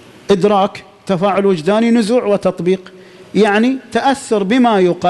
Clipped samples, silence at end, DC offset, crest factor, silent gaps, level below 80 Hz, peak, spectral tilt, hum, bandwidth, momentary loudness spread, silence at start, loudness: under 0.1%; 0 s; under 0.1%; 12 dB; none; -52 dBFS; -2 dBFS; -6 dB/octave; none; 12 kHz; 7 LU; 0.3 s; -14 LUFS